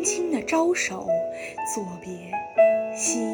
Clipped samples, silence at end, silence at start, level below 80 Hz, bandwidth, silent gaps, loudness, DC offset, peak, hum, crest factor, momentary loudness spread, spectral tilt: under 0.1%; 0 s; 0 s; -64 dBFS; 19.5 kHz; none; -24 LUFS; under 0.1%; -8 dBFS; none; 16 dB; 12 LU; -3 dB/octave